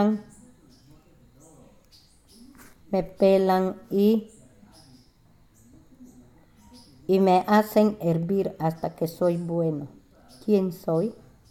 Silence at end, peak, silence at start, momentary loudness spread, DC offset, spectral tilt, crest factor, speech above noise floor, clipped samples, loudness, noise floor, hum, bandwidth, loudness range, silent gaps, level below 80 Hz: 0.4 s; -8 dBFS; 0 s; 10 LU; under 0.1%; -7.5 dB/octave; 18 dB; 35 dB; under 0.1%; -24 LUFS; -58 dBFS; none; 16.5 kHz; 7 LU; none; -58 dBFS